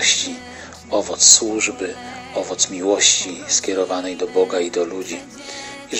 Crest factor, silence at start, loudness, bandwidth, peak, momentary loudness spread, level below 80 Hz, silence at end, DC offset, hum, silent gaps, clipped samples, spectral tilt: 20 dB; 0 s; -17 LUFS; 16 kHz; 0 dBFS; 20 LU; -56 dBFS; 0 s; under 0.1%; none; none; under 0.1%; -0.5 dB/octave